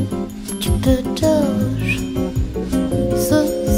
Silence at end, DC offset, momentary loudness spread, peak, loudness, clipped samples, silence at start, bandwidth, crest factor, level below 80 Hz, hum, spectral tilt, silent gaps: 0 s; under 0.1%; 7 LU; -2 dBFS; -19 LUFS; under 0.1%; 0 s; 16.5 kHz; 16 dB; -28 dBFS; none; -6 dB/octave; none